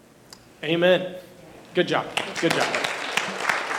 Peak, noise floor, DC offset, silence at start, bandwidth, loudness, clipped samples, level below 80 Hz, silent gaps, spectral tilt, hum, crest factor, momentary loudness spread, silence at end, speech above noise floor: -6 dBFS; -49 dBFS; under 0.1%; 0.6 s; 17.5 kHz; -24 LUFS; under 0.1%; -66 dBFS; none; -3.5 dB/octave; none; 20 dB; 10 LU; 0 s; 26 dB